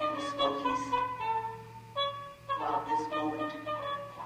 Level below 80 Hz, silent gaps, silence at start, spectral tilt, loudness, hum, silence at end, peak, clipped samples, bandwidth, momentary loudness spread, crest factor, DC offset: -64 dBFS; none; 0 s; -4.5 dB/octave; -33 LUFS; none; 0 s; -18 dBFS; under 0.1%; 16 kHz; 7 LU; 16 dB; under 0.1%